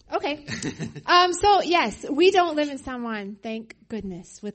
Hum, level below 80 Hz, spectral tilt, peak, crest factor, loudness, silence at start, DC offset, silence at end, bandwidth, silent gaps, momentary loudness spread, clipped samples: none; -52 dBFS; -3.5 dB/octave; -4 dBFS; 18 dB; -22 LUFS; 0.1 s; under 0.1%; 0.05 s; 8.8 kHz; none; 16 LU; under 0.1%